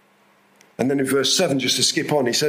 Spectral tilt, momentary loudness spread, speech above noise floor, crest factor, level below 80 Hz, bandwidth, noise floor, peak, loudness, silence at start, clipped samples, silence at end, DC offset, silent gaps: -3 dB/octave; 5 LU; 38 dB; 16 dB; -66 dBFS; 16 kHz; -57 dBFS; -4 dBFS; -19 LUFS; 0.8 s; under 0.1%; 0 s; under 0.1%; none